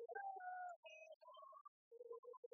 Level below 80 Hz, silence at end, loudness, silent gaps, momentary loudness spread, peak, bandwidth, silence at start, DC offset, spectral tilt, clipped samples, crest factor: under -90 dBFS; 0.05 s; -56 LUFS; 0.76-0.83 s, 1.16-1.20 s, 1.61-1.91 s, 2.19-2.23 s, 2.37-2.43 s; 13 LU; -40 dBFS; 6.2 kHz; 0 s; under 0.1%; 3.5 dB/octave; under 0.1%; 16 dB